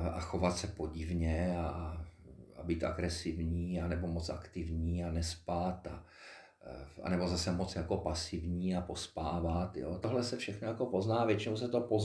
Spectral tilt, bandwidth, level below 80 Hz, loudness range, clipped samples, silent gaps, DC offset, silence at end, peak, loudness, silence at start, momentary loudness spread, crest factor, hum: -6 dB/octave; 11 kHz; -48 dBFS; 3 LU; under 0.1%; none; under 0.1%; 0 s; -16 dBFS; -37 LUFS; 0 s; 14 LU; 20 dB; none